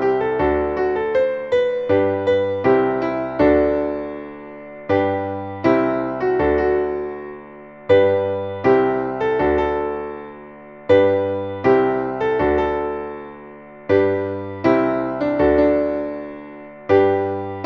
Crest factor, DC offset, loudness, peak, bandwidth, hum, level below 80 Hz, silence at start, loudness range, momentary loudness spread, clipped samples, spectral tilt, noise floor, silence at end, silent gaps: 16 dB; under 0.1%; -19 LUFS; -2 dBFS; 6.2 kHz; none; -42 dBFS; 0 s; 2 LU; 19 LU; under 0.1%; -8.5 dB/octave; -39 dBFS; 0 s; none